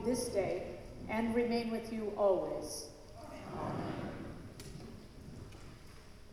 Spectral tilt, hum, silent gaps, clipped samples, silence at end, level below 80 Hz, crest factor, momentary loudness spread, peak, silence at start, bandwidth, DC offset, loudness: -5.5 dB/octave; none; none; under 0.1%; 0 s; -56 dBFS; 18 dB; 19 LU; -20 dBFS; 0 s; 15 kHz; under 0.1%; -37 LUFS